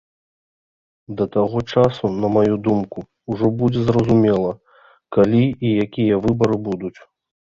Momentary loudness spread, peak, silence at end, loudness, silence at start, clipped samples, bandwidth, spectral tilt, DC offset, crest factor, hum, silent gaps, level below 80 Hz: 13 LU; -2 dBFS; 0.7 s; -19 LUFS; 1.1 s; under 0.1%; 7.4 kHz; -8.5 dB/octave; under 0.1%; 18 dB; none; none; -48 dBFS